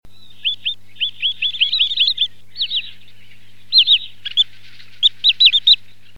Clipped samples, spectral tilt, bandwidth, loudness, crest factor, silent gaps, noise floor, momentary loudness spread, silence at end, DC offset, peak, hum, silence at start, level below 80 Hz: under 0.1%; 1 dB/octave; 16.5 kHz; -14 LUFS; 18 dB; none; -49 dBFS; 13 LU; 0.45 s; 3%; 0 dBFS; 50 Hz at -55 dBFS; 0 s; -60 dBFS